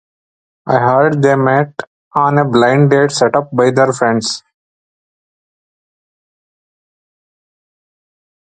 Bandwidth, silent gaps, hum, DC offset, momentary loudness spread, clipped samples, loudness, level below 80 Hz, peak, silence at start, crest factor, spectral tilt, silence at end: 9.4 kHz; 1.87-2.11 s; none; under 0.1%; 10 LU; under 0.1%; -12 LUFS; -56 dBFS; 0 dBFS; 0.65 s; 16 dB; -5.5 dB/octave; 4.05 s